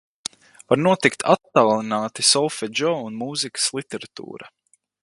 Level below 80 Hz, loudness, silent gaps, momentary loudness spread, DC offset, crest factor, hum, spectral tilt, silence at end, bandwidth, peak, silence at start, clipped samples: -66 dBFS; -20 LUFS; none; 17 LU; under 0.1%; 22 dB; none; -3 dB/octave; 0.55 s; 11.5 kHz; 0 dBFS; 0.7 s; under 0.1%